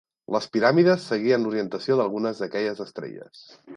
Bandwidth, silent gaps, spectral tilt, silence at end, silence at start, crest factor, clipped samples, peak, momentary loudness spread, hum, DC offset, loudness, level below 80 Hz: 10.5 kHz; none; -6.5 dB/octave; 0 s; 0.3 s; 18 dB; under 0.1%; -6 dBFS; 16 LU; none; under 0.1%; -23 LUFS; -72 dBFS